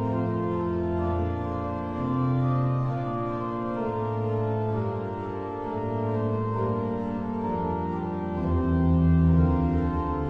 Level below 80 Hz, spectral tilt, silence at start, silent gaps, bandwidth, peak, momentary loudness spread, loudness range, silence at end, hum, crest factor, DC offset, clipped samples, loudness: -38 dBFS; -11 dB/octave; 0 s; none; 5 kHz; -10 dBFS; 8 LU; 4 LU; 0 s; none; 16 dB; under 0.1%; under 0.1%; -27 LUFS